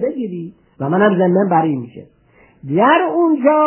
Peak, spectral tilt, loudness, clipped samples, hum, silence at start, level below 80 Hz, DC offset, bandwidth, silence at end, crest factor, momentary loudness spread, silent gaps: 0 dBFS; -11 dB/octave; -15 LUFS; under 0.1%; none; 0 s; -62 dBFS; under 0.1%; 3.2 kHz; 0 s; 16 dB; 18 LU; none